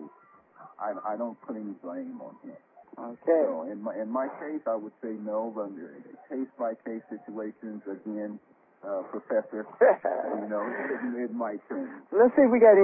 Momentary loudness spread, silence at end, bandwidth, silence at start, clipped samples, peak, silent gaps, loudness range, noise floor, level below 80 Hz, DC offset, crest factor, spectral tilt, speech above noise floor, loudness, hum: 19 LU; 0 s; 2.9 kHz; 0 s; under 0.1%; -8 dBFS; none; 10 LU; -58 dBFS; -78 dBFS; under 0.1%; 20 dB; -11.5 dB/octave; 30 dB; -29 LUFS; none